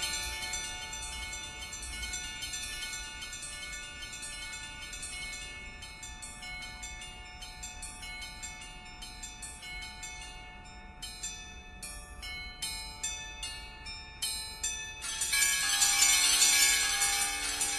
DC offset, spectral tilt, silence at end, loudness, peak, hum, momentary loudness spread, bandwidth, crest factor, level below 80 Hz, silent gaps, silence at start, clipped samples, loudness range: under 0.1%; 1 dB/octave; 0 s; -31 LUFS; -10 dBFS; none; 20 LU; 14 kHz; 24 dB; -50 dBFS; none; 0 s; under 0.1%; 17 LU